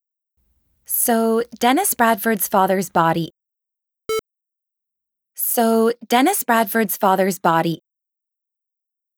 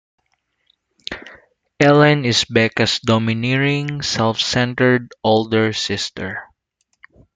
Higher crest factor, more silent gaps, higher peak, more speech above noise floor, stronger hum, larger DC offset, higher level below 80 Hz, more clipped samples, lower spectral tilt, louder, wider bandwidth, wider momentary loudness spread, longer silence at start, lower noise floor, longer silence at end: about the same, 18 dB vs 18 dB; neither; about the same, -2 dBFS vs 0 dBFS; first, 67 dB vs 53 dB; neither; neither; second, -64 dBFS vs -52 dBFS; neither; about the same, -4 dB/octave vs -5 dB/octave; about the same, -18 LUFS vs -17 LUFS; first, over 20 kHz vs 9.4 kHz; second, 10 LU vs 17 LU; second, 0.9 s vs 1.1 s; first, -84 dBFS vs -69 dBFS; first, 1.4 s vs 0.9 s